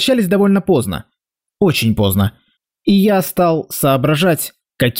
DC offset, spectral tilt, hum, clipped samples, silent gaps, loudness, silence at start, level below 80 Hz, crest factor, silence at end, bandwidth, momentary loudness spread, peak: under 0.1%; -5.5 dB/octave; none; under 0.1%; none; -15 LUFS; 0 s; -46 dBFS; 10 dB; 0 s; 16.5 kHz; 8 LU; -4 dBFS